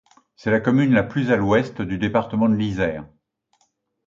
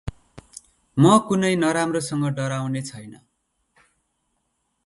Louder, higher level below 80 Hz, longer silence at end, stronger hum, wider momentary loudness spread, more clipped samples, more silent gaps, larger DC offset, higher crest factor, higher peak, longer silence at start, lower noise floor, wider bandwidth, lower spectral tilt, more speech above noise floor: about the same, -20 LUFS vs -21 LUFS; about the same, -48 dBFS vs -52 dBFS; second, 1 s vs 1.7 s; neither; second, 8 LU vs 23 LU; neither; neither; neither; about the same, 18 dB vs 20 dB; about the same, -4 dBFS vs -4 dBFS; first, 0.45 s vs 0.05 s; second, -68 dBFS vs -73 dBFS; second, 7.4 kHz vs 11.5 kHz; first, -8 dB/octave vs -6 dB/octave; second, 48 dB vs 52 dB